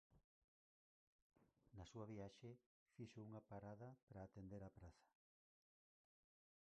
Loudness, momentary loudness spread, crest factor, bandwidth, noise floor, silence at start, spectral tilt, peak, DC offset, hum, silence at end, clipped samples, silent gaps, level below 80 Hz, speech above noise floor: -60 LUFS; 9 LU; 18 dB; 8.2 kHz; under -90 dBFS; 0.1 s; -7 dB/octave; -44 dBFS; under 0.1%; none; 1.55 s; under 0.1%; 0.24-1.30 s, 2.66-2.86 s, 4.02-4.07 s; -78 dBFS; over 31 dB